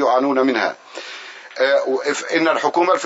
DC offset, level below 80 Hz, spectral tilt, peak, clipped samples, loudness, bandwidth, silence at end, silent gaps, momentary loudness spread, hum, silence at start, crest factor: under 0.1%; -80 dBFS; -3 dB/octave; -2 dBFS; under 0.1%; -18 LUFS; 8 kHz; 0 s; none; 16 LU; none; 0 s; 16 dB